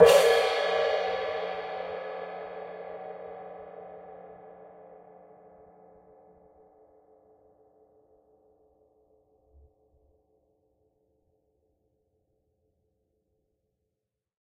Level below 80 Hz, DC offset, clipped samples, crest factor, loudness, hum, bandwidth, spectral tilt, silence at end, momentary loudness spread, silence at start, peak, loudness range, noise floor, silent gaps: -66 dBFS; under 0.1%; under 0.1%; 28 dB; -28 LUFS; none; 15.5 kHz; -2.5 dB/octave; 9.75 s; 26 LU; 0 s; -4 dBFS; 27 LU; -86 dBFS; none